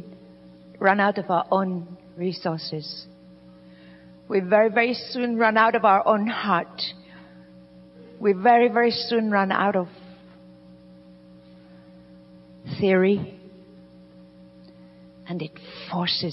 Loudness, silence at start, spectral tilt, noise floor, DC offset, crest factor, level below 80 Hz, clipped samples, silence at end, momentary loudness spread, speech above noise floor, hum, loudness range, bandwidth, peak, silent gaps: -22 LUFS; 0 s; -9 dB/octave; -49 dBFS; under 0.1%; 20 dB; -66 dBFS; under 0.1%; 0 s; 18 LU; 27 dB; none; 8 LU; 5.8 kHz; -6 dBFS; none